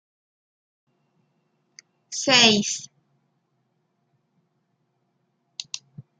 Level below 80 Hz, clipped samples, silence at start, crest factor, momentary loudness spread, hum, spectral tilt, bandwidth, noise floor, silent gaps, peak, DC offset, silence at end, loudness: -74 dBFS; under 0.1%; 2.1 s; 28 dB; 23 LU; none; -1.5 dB/octave; 10 kHz; -72 dBFS; none; -2 dBFS; under 0.1%; 0.2 s; -18 LUFS